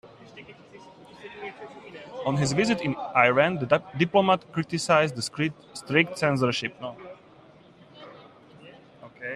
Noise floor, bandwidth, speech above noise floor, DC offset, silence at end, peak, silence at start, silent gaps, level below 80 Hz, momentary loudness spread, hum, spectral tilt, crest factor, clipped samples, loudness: -53 dBFS; 13 kHz; 28 dB; under 0.1%; 0 s; -4 dBFS; 0.05 s; none; -64 dBFS; 24 LU; none; -5 dB/octave; 22 dB; under 0.1%; -24 LUFS